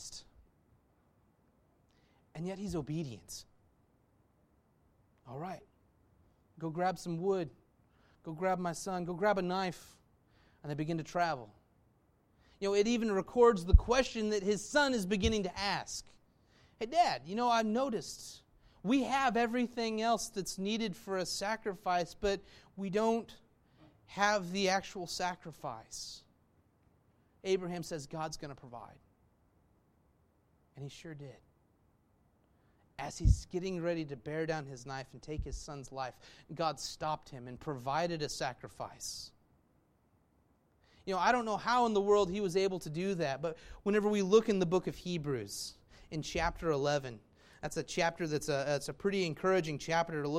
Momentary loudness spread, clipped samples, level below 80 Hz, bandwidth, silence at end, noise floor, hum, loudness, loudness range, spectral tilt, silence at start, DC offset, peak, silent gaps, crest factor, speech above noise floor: 16 LU; under 0.1%; -46 dBFS; 16 kHz; 0 s; -72 dBFS; none; -34 LUFS; 13 LU; -5 dB/octave; 0 s; under 0.1%; -10 dBFS; none; 26 dB; 38 dB